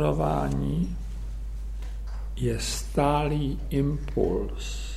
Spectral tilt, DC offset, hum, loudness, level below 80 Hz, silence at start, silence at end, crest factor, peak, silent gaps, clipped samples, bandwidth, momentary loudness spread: -6 dB/octave; under 0.1%; none; -29 LUFS; -32 dBFS; 0 s; 0 s; 18 dB; -10 dBFS; none; under 0.1%; 14.5 kHz; 13 LU